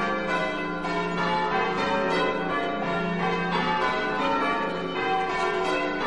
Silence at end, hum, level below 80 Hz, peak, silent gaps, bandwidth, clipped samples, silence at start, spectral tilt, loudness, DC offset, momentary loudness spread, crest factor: 0 s; none; -52 dBFS; -12 dBFS; none; 11.5 kHz; under 0.1%; 0 s; -5.5 dB/octave; -26 LUFS; 0.5%; 3 LU; 14 dB